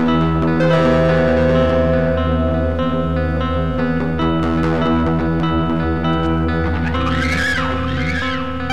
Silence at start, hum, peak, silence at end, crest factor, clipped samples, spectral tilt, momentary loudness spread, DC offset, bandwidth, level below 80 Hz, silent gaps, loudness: 0 s; none; -2 dBFS; 0 s; 14 dB; under 0.1%; -7.5 dB/octave; 5 LU; 3%; 9.6 kHz; -28 dBFS; none; -17 LUFS